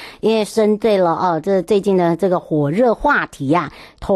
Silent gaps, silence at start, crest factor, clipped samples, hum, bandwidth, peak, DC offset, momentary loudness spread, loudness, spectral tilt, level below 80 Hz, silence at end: none; 0 s; 10 dB; under 0.1%; none; 12.5 kHz; -6 dBFS; under 0.1%; 4 LU; -16 LUFS; -6.5 dB/octave; -44 dBFS; 0 s